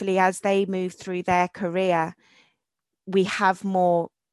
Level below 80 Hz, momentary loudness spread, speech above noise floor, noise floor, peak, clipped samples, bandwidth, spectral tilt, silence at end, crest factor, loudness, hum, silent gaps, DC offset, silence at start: -62 dBFS; 7 LU; 62 dB; -85 dBFS; -6 dBFS; under 0.1%; 12 kHz; -5.5 dB/octave; 0.25 s; 18 dB; -24 LUFS; none; none; under 0.1%; 0 s